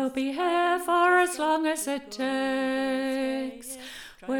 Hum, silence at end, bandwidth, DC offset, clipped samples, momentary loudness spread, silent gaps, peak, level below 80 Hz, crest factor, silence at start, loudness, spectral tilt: none; 0 s; 19 kHz; under 0.1%; under 0.1%; 17 LU; none; -10 dBFS; -62 dBFS; 16 dB; 0 s; -26 LUFS; -2 dB/octave